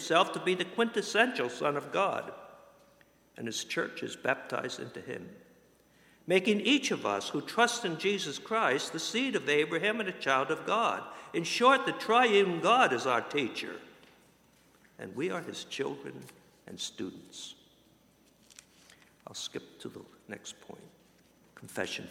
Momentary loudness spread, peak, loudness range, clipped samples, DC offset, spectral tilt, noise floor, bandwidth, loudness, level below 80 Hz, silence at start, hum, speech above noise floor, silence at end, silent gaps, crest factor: 20 LU; -8 dBFS; 18 LU; under 0.1%; under 0.1%; -3.5 dB/octave; -64 dBFS; 16 kHz; -30 LUFS; -76 dBFS; 0 s; none; 33 dB; 0 s; none; 24 dB